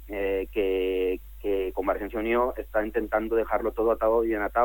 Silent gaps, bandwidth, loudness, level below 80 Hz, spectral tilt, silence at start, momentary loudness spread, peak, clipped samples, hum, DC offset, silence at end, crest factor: none; 17.5 kHz; -27 LUFS; -44 dBFS; -7 dB/octave; 0 s; 5 LU; -10 dBFS; under 0.1%; none; under 0.1%; 0 s; 16 dB